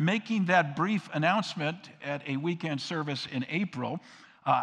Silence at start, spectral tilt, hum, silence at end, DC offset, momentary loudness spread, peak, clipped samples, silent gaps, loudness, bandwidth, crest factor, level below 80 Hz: 0 s; -6 dB/octave; none; 0 s; under 0.1%; 11 LU; -10 dBFS; under 0.1%; none; -30 LUFS; 10 kHz; 20 dB; -78 dBFS